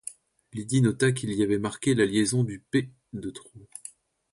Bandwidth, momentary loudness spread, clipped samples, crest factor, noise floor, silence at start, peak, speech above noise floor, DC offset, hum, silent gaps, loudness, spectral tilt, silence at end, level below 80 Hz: 11.5 kHz; 19 LU; under 0.1%; 18 dB; -49 dBFS; 0.05 s; -10 dBFS; 23 dB; under 0.1%; none; none; -26 LUFS; -5.5 dB/octave; 0.65 s; -60 dBFS